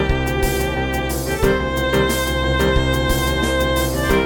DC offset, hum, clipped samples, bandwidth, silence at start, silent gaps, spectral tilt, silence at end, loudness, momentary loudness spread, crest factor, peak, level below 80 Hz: 0.3%; none; under 0.1%; 17.5 kHz; 0 s; none; -5 dB/octave; 0 s; -19 LUFS; 4 LU; 16 dB; -2 dBFS; -24 dBFS